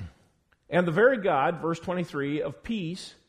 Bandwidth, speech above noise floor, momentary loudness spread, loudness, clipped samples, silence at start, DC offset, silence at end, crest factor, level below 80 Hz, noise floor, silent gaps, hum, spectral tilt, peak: 11 kHz; 39 dB; 11 LU; -27 LUFS; under 0.1%; 0 s; under 0.1%; 0.15 s; 18 dB; -58 dBFS; -66 dBFS; none; none; -6.5 dB/octave; -10 dBFS